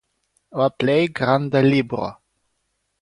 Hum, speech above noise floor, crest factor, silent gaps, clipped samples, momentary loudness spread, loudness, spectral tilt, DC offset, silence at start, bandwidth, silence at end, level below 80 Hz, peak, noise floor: none; 54 dB; 18 dB; none; under 0.1%; 12 LU; -19 LUFS; -7.5 dB/octave; under 0.1%; 0.55 s; 10.5 kHz; 0.9 s; -58 dBFS; -4 dBFS; -73 dBFS